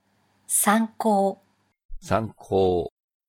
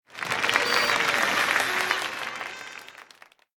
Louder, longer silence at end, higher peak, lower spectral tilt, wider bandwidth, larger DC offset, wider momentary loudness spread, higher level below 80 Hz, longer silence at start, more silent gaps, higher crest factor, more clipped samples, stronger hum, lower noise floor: about the same, -23 LUFS vs -24 LUFS; second, 0.4 s vs 0.55 s; about the same, -4 dBFS vs -4 dBFS; first, -4.5 dB/octave vs -1 dB/octave; about the same, 18 kHz vs 19 kHz; neither; second, 8 LU vs 15 LU; first, -48 dBFS vs -64 dBFS; first, 0.5 s vs 0.1 s; first, 1.85-1.89 s vs none; about the same, 20 dB vs 22 dB; neither; neither; about the same, -55 dBFS vs -54 dBFS